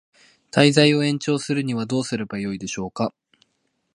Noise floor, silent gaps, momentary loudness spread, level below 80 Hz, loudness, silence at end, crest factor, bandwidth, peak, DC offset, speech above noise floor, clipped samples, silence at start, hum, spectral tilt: -72 dBFS; none; 13 LU; -60 dBFS; -21 LUFS; 0.85 s; 22 dB; 11.5 kHz; 0 dBFS; under 0.1%; 51 dB; under 0.1%; 0.55 s; none; -5 dB/octave